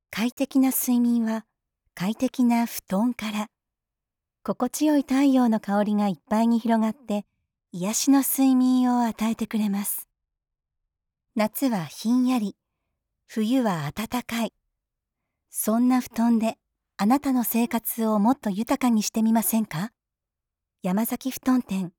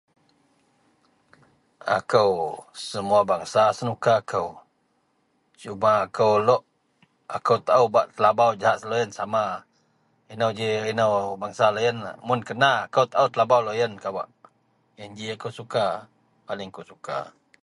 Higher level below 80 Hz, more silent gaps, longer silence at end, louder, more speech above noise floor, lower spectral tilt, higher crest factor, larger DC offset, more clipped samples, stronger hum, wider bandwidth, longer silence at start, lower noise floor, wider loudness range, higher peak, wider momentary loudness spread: about the same, -64 dBFS vs -66 dBFS; first, 0.32-0.37 s vs none; second, 0.1 s vs 0.35 s; about the same, -24 LUFS vs -23 LUFS; first, 63 dB vs 46 dB; about the same, -5 dB/octave vs -5 dB/octave; about the same, 16 dB vs 20 dB; neither; neither; neither; first, over 20 kHz vs 11.5 kHz; second, 0.1 s vs 1.85 s; first, -87 dBFS vs -69 dBFS; about the same, 5 LU vs 5 LU; second, -10 dBFS vs -4 dBFS; second, 11 LU vs 16 LU